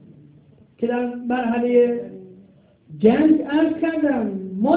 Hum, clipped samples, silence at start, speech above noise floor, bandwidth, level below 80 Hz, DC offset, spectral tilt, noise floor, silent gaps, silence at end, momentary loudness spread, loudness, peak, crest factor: none; under 0.1%; 0.8 s; 33 dB; 4 kHz; -58 dBFS; under 0.1%; -11 dB/octave; -52 dBFS; none; 0 s; 10 LU; -20 LUFS; -2 dBFS; 18 dB